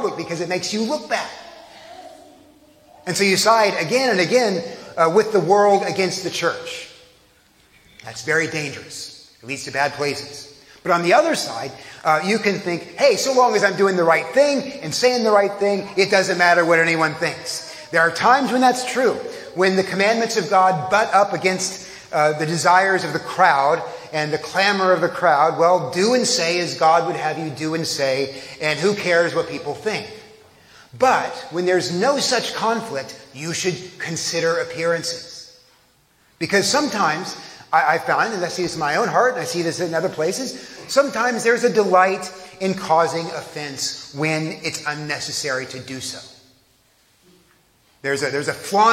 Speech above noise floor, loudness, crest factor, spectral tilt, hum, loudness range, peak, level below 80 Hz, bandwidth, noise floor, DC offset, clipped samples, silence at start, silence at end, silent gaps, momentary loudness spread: 39 dB; -19 LUFS; 18 dB; -3.5 dB/octave; none; 8 LU; -2 dBFS; -66 dBFS; 16.5 kHz; -58 dBFS; under 0.1%; under 0.1%; 0 s; 0 s; none; 14 LU